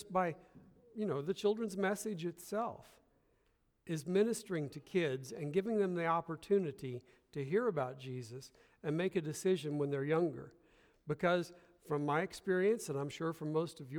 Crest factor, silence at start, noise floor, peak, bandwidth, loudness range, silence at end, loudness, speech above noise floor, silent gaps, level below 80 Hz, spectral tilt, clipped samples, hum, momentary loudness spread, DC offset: 18 dB; 0 s; -76 dBFS; -20 dBFS; 19.5 kHz; 3 LU; 0 s; -37 LUFS; 39 dB; none; -74 dBFS; -6 dB/octave; under 0.1%; none; 12 LU; under 0.1%